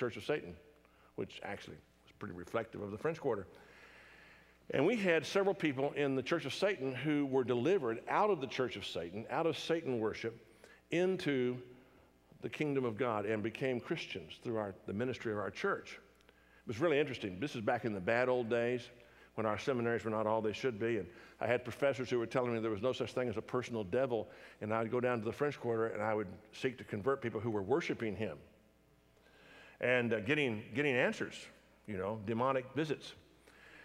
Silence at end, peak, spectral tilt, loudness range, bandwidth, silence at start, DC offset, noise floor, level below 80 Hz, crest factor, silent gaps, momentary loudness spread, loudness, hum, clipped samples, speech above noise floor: 0 s; -16 dBFS; -6 dB/octave; 5 LU; 14.5 kHz; 0 s; under 0.1%; -68 dBFS; -74 dBFS; 20 dB; none; 13 LU; -36 LUFS; none; under 0.1%; 32 dB